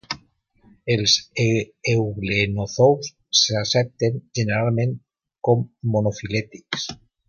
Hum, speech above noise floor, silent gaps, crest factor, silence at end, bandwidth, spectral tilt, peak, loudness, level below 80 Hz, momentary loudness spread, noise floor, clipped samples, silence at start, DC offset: none; 37 dB; none; 18 dB; 0.35 s; 7.2 kHz; -4.5 dB/octave; -4 dBFS; -21 LUFS; -50 dBFS; 10 LU; -58 dBFS; under 0.1%; 0.1 s; under 0.1%